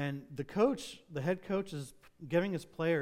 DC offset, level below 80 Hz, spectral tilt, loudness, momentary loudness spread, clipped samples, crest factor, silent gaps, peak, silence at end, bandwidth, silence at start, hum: under 0.1%; -66 dBFS; -6.5 dB/octave; -35 LUFS; 12 LU; under 0.1%; 18 dB; none; -18 dBFS; 0 s; 16 kHz; 0 s; none